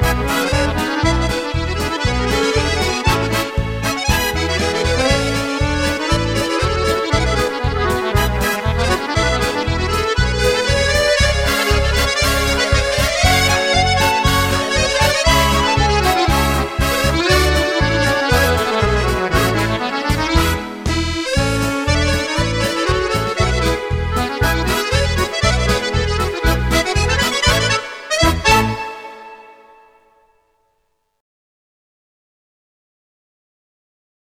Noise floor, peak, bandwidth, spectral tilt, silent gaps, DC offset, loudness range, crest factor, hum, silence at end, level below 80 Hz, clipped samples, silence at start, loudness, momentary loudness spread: -67 dBFS; 0 dBFS; 17 kHz; -4 dB/octave; none; under 0.1%; 3 LU; 16 dB; none; 4.8 s; -24 dBFS; under 0.1%; 0 s; -16 LUFS; 5 LU